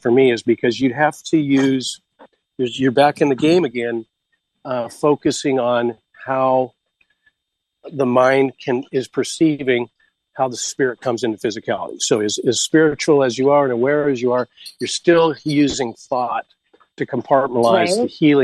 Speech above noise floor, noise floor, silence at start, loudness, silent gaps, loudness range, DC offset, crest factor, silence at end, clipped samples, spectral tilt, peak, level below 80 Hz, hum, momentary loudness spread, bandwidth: 60 dB; -77 dBFS; 0.05 s; -18 LUFS; none; 4 LU; under 0.1%; 16 dB; 0 s; under 0.1%; -4.5 dB/octave; -2 dBFS; -60 dBFS; none; 10 LU; 12.5 kHz